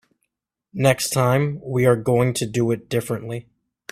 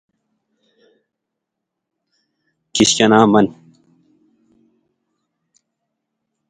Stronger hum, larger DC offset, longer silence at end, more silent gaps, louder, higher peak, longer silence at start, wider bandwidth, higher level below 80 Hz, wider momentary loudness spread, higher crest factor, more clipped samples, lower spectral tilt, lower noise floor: neither; neither; second, 0.5 s vs 3 s; neither; second, -21 LUFS vs -14 LUFS; about the same, -2 dBFS vs 0 dBFS; second, 0.75 s vs 2.75 s; first, 16 kHz vs 10.5 kHz; about the same, -54 dBFS vs -58 dBFS; about the same, 10 LU vs 10 LU; about the same, 20 dB vs 22 dB; neither; first, -5.5 dB/octave vs -4 dB/octave; about the same, -78 dBFS vs -80 dBFS